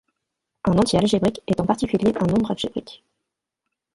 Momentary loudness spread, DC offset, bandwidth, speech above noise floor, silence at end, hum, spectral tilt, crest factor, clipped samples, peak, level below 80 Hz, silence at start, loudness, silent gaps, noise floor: 9 LU; under 0.1%; 11.5 kHz; 61 dB; 1 s; none; -6.5 dB/octave; 20 dB; under 0.1%; -2 dBFS; -46 dBFS; 0.65 s; -21 LUFS; none; -82 dBFS